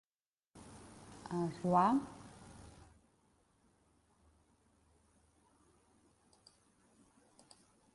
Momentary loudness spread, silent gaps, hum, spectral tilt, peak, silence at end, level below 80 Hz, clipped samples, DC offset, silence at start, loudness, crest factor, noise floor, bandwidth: 27 LU; none; none; -7 dB/octave; -18 dBFS; 5.25 s; -70 dBFS; under 0.1%; under 0.1%; 0.55 s; -35 LUFS; 26 dB; under -90 dBFS; 11.5 kHz